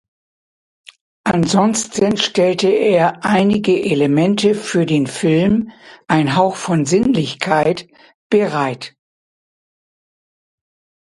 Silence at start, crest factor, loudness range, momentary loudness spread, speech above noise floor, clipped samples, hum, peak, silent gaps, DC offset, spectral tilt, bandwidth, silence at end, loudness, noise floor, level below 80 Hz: 1.25 s; 16 dB; 6 LU; 5 LU; over 75 dB; under 0.1%; none; 0 dBFS; 8.14-8.30 s; under 0.1%; -5.5 dB/octave; 11.5 kHz; 2.2 s; -16 LUFS; under -90 dBFS; -52 dBFS